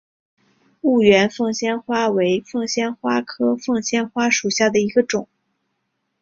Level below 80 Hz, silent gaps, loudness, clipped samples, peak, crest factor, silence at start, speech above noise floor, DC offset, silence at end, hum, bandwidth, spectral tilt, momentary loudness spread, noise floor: -60 dBFS; none; -19 LUFS; under 0.1%; -2 dBFS; 18 dB; 0.85 s; 55 dB; under 0.1%; 1 s; none; 7.6 kHz; -4 dB/octave; 8 LU; -73 dBFS